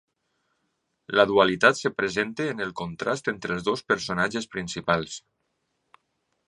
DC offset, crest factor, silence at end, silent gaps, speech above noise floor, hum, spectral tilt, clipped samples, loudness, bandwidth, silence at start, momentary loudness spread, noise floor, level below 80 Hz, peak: under 0.1%; 24 dB; 1.3 s; none; 51 dB; none; -4 dB/octave; under 0.1%; -25 LUFS; 11 kHz; 1.1 s; 12 LU; -76 dBFS; -60 dBFS; -2 dBFS